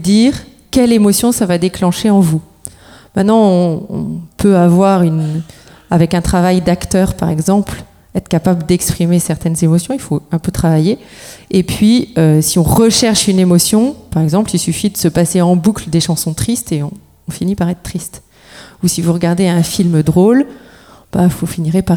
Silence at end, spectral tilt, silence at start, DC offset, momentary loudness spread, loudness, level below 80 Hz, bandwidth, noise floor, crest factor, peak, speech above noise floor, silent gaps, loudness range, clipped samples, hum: 0 s; -5.5 dB/octave; 0 s; under 0.1%; 12 LU; -13 LUFS; -36 dBFS; 17.5 kHz; -39 dBFS; 12 dB; 0 dBFS; 27 dB; none; 4 LU; under 0.1%; none